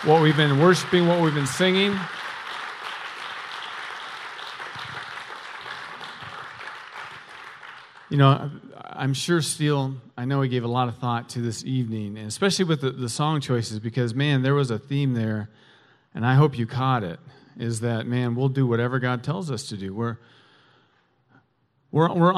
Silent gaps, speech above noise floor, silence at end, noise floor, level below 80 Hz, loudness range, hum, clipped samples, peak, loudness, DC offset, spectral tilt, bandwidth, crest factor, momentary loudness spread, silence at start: none; 44 dB; 0 s; -67 dBFS; -64 dBFS; 10 LU; none; under 0.1%; -4 dBFS; -24 LUFS; under 0.1%; -5.5 dB/octave; 13 kHz; 20 dB; 17 LU; 0 s